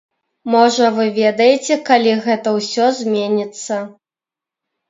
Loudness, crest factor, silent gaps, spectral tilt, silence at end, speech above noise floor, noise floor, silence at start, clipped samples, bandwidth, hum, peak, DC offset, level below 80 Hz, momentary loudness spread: -15 LUFS; 16 dB; none; -4 dB/octave; 1 s; 74 dB; -89 dBFS; 0.45 s; under 0.1%; 7.8 kHz; none; 0 dBFS; under 0.1%; -70 dBFS; 11 LU